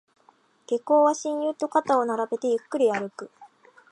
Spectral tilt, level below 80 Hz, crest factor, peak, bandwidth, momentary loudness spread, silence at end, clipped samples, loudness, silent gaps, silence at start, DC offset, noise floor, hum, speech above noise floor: -4.5 dB/octave; -80 dBFS; 18 dB; -8 dBFS; 11 kHz; 12 LU; 0.45 s; under 0.1%; -24 LUFS; none; 0.7 s; under 0.1%; -61 dBFS; none; 37 dB